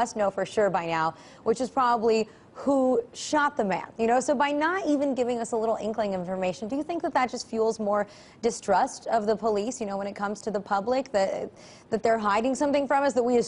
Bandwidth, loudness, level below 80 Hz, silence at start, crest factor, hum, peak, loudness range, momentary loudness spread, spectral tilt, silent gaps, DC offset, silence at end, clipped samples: 11 kHz; -27 LUFS; -62 dBFS; 0 s; 14 dB; none; -12 dBFS; 3 LU; 7 LU; -4.5 dB/octave; none; under 0.1%; 0 s; under 0.1%